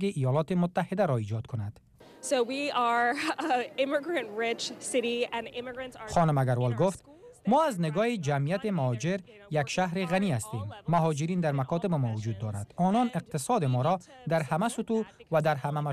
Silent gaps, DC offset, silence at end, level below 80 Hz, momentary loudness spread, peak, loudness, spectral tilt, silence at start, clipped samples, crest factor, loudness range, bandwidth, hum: none; under 0.1%; 0 s; -62 dBFS; 9 LU; -16 dBFS; -29 LUFS; -6 dB/octave; 0 s; under 0.1%; 14 dB; 1 LU; 14 kHz; none